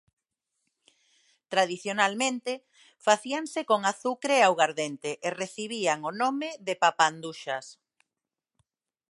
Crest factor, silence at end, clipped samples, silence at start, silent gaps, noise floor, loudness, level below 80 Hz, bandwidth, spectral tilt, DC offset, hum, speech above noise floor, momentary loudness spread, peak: 24 dB; 1.35 s; under 0.1%; 1.5 s; none; -89 dBFS; -27 LUFS; -84 dBFS; 11.5 kHz; -2.5 dB/octave; under 0.1%; none; 61 dB; 12 LU; -4 dBFS